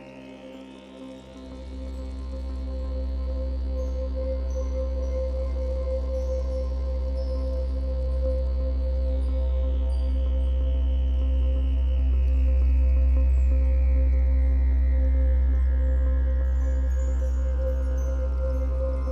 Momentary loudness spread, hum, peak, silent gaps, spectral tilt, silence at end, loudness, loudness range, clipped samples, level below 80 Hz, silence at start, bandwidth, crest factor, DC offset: 13 LU; none; -14 dBFS; none; -9 dB/octave; 0 s; -26 LUFS; 8 LU; under 0.1%; -24 dBFS; 0 s; 4.8 kHz; 8 dB; under 0.1%